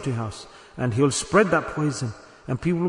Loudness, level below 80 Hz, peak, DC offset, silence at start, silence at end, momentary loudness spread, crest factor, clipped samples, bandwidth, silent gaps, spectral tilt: -24 LUFS; -52 dBFS; -4 dBFS; under 0.1%; 0 s; 0 s; 18 LU; 20 dB; under 0.1%; 11 kHz; none; -5.5 dB/octave